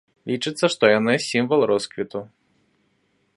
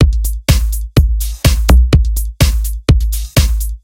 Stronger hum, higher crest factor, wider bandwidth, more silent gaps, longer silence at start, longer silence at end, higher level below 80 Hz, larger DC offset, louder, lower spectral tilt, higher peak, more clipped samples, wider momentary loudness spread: neither; first, 22 dB vs 12 dB; second, 11.5 kHz vs 16.5 kHz; neither; first, 0.25 s vs 0 s; first, 1.1 s vs 0.05 s; second, -68 dBFS vs -12 dBFS; neither; second, -21 LUFS vs -14 LUFS; about the same, -4.5 dB/octave vs -5 dB/octave; about the same, -2 dBFS vs 0 dBFS; second, under 0.1% vs 0.5%; first, 13 LU vs 7 LU